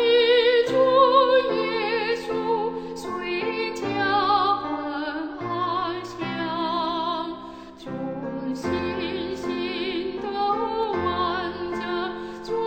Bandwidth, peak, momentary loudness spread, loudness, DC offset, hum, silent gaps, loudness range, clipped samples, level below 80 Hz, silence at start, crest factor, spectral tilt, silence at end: 9 kHz; -6 dBFS; 13 LU; -24 LUFS; under 0.1%; none; none; 7 LU; under 0.1%; -56 dBFS; 0 s; 18 dB; -5 dB/octave; 0 s